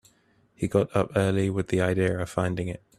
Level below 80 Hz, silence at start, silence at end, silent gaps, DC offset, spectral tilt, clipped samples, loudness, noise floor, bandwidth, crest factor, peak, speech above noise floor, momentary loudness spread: -54 dBFS; 0.6 s; 0.2 s; none; under 0.1%; -7 dB/octave; under 0.1%; -26 LUFS; -64 dBFS; 13 kHz; 18 dB; -8 dBFS; 38 dB; 5 LU